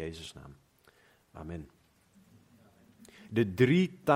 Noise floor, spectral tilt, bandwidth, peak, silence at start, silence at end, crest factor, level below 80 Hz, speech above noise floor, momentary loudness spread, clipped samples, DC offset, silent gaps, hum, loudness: -65 dBFS; -7 dB/octave; 16 kHz; -10 dBFS; 0 s; 0 s; 22 dB; -64 dBFS; 35 dB; 24 LU; under 0.1%; under 0.1%; none; none; -30 LUFS